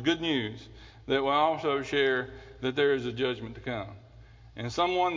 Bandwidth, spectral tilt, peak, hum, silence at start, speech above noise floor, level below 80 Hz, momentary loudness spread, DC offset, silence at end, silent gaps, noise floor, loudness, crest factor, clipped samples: 7.6 kHz; -5.5 dB/octave; -12 dBFS; none; 0 s; 23 dB; -56 dBFS; 17 LU; under 0.1%; 0 s; none; -52 dBFS; -29 LUFS; 18 dB; under 0.1%